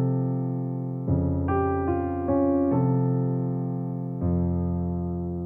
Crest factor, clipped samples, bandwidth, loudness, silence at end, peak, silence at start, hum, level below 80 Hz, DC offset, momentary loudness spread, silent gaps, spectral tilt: 12 dB; under 0.1%; 2.9 kHz; -26 LUFS; 0 s; -12 dBFS; 0 s; none; -42 dBFS; under 0.1%; 7 LU; none; -13.5 dB/octave